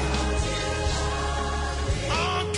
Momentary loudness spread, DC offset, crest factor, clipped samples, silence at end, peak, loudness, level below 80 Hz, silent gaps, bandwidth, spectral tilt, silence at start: 3 LU; under 0.1%; 14 dB; under 0.1%; 0 s; -12 dBFS; -27 LUFS; -30 dBFS; none; 11 kHz; -4 dB/octave; 0 s